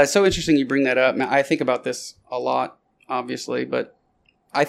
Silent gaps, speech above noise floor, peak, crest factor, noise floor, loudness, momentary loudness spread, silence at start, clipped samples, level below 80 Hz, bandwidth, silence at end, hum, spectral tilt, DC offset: none; 43 dB; -4 dBFS; 18 dB; -64 dBFS; -22 LUFS; 12 LU; 0 s; under 0.1%; -48 dBFS; 15.5 kHz; 0 s; none; -4 dB/octave; under 0.1%